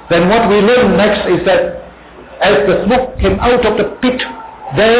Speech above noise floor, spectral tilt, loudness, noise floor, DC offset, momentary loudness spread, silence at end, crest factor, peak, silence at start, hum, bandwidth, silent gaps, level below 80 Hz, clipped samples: 24 dB; -10 dB/octave; -12 LUFS; -35 dBFS; under 0.1%; 11 LU; 0 s; 8 dB; -2 dBFS; 0.05 s; none; 4 kHz; none; -30 dBFS; under 0.1%